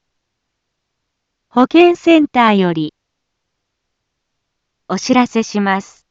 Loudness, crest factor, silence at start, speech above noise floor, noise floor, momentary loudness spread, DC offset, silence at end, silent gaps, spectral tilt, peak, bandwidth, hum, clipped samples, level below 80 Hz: -13 LUFS; 16 dB; 1.55 s; 61 dB; -74 dBFS; 12 LU; under 0.1%; 0.3 s; none; -5.5 dB/octave; 0 dBFS; 7.8 kHz; none; under 0.1%; -60 dBFS